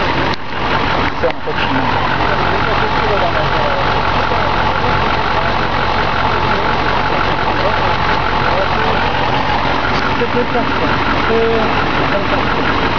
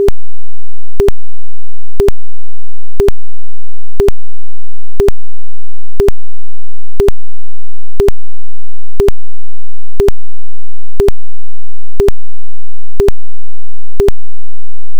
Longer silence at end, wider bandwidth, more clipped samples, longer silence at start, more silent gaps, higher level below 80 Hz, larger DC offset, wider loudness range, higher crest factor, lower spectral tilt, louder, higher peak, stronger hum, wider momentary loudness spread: about the same, 0 s vs 0 s; second, 5.4 kHz vs 19 kHz; second, under 0.1% vs 30%; about the same, 0 s vs 0 s; neither; second, -28 dBFS vs -22 dBFS; second, 8% vs 80%; about the same, 0 LU vs 0 LU; about the same, 12 dB vs 14 dB; about the same, -6 dB/octave vs -7 dB/octave; about the same, -15 LUFS vs -16 LUFS; second, -4 dBFS vs 0 dBFS; neither; about the same, 1 LU vs 0 LU